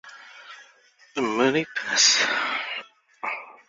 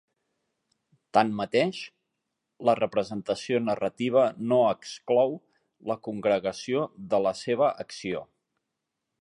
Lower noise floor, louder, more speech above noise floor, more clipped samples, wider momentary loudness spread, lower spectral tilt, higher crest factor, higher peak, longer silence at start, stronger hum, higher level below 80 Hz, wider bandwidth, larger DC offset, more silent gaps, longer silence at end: second, -57 dBFS vs -84 dBFS; first, -22 LUFS vs -27 LUFS; second, 33 dB vs 58 dB; neither; first, 26 LU vs 11 LU; second, -1 dB/octave vs -5.5 dB/octave; about the same, 22 dB vs 22 dB; about the same, -4 dBFS vs -6 dBFS; second, 0.05 s vs 1.15 s; neither; about the same, -72 dBFS vs -68 dBFS; second, 7.8 kHz vs 11 kHz; neither; neither; second, 0.15 s vs 0.95 s